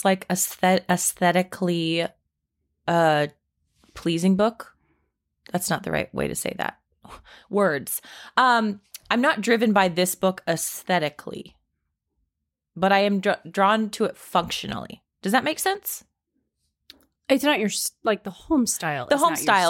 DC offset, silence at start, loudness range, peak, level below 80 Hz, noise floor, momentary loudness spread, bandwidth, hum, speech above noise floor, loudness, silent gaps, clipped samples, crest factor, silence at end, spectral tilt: under 0.1%; 0 s; 5 LU; -4 dBFS; -58 dBFS; -81 dBFS; 12 LU; 17 kHz; none; 58 dB; -23 LUFS; none; under 0.1%; 20 dB; 0 s; -4 dB/octave